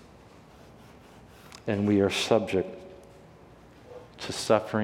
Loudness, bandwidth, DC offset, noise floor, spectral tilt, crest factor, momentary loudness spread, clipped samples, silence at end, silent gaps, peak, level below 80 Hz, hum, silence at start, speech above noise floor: -27 LUFS; 16 kHz; under 0.1%; -52 dBFS; -5 dB/octave; 22 dB; 24 LU; under 0.1%; 0 s; none; -8 dBFS; -62 dBFS; none; 1.15 s; 27 dB